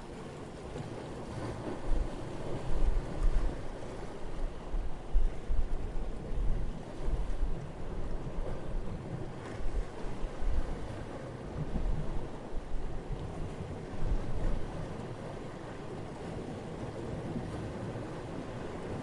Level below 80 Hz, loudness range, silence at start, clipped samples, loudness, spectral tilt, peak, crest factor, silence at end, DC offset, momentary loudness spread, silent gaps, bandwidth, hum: -36 dBFS; 2 LU; 0 s; under 0.1%; -40 LUFS; -7 dB/octave; -16 dBFS; 18 dB; 0 s; under 0.1%; 6 LU; none; 10.5 kHz; none